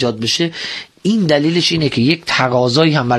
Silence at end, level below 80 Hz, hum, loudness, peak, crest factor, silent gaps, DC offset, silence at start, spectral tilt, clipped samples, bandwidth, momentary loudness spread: 0 s; -50 dBFS; none; -15 LUFS; 0 dBFS; 14 dB; none; under 0.1%; 0 s; -5 dB/octave; under 0.1%; 12.5 kHz; 7 LU